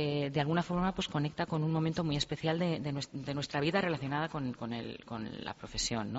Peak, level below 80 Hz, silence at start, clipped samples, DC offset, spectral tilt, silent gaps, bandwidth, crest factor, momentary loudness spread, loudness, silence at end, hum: -16 dBFS; -56 dBFS; 0 s; under 0.1%; under 0.1%; -5 dB/octave; none; 8 kHz; 18 dB; 9 LU; -34 LUFS; 0 s; none